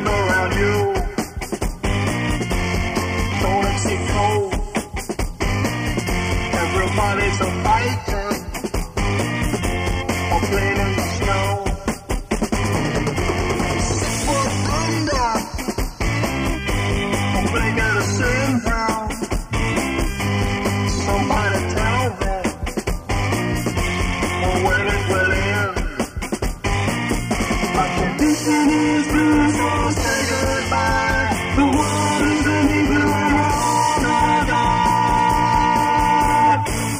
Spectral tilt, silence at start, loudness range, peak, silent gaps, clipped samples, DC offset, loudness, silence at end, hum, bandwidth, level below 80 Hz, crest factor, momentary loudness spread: -5 dB/octave; 0 s; 4 LU; -4 dBFS; none; under 0.1%; under 0.1%; -19 LUFS; 0 s; none; 15.5 kHz; -28 dBFS; 14 dB; 8 LU